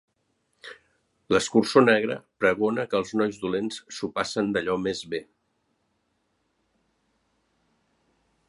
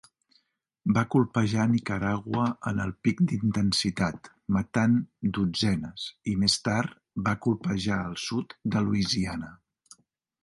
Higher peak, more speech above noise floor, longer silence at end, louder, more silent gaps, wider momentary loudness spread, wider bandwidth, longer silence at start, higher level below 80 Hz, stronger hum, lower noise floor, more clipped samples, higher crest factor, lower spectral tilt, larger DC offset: first, -4 dBFS vs -8 dBFS; first, 49 dB vs 43 dB; first, 3.25 s vs 0.9 s; about the same, -25 LUFS vs -27 LUFS; neither; first, 15 LU vs 7 LU; about the same, 11.5 kHz vs 11.5 kHz; second, 0.65 s vs 0.85 s; second, -64 dBFS vs -52 dBFS; neither; about the same, -73 dBFS vs -70 dBFS; neither; about the same, 24 dB vs 20 dB; about the same, -4.5 dB/octave vs -5.5 dB/octave; neither